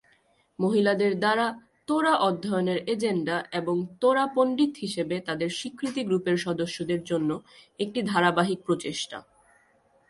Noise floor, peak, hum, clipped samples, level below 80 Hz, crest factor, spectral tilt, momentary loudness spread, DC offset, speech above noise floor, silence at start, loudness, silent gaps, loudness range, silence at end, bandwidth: -65 dBFS; -8 dBFS; none; under 0.1%; -68 dBFS; 18 dB; -5.5 dB/octave; 8 LU; under 0.1%; 39 dB; 0.6 s; -26 LUFS; none; 3 LU; 0.9 s; 11.5 kHz